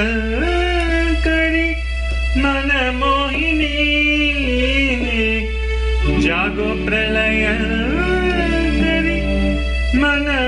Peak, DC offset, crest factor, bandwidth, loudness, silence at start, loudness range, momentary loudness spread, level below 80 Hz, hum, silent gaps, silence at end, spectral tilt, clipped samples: -6 dBFS; under 0.1%; 12 dB; 10.5 kHz; -17 LUFS; 0 s; 1 LU; 4 LU; -22 dBFS; none; none; 0 s; -6 dB/octave; under 0.1%